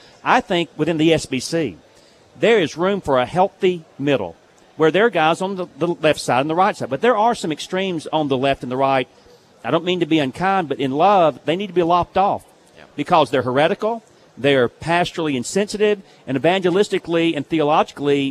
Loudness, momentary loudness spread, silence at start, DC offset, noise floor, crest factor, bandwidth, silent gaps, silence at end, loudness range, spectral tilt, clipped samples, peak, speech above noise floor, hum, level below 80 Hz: -19 LUFS; 7 LU; 0.25 s; under 0.1%; -50 dBFS; 18 dB; 13.5 kHz; none; 0 s; 2 LU; -5 dB/octave; under 0.1%; -2 dBFS; 32 dB; none; -54 dBFS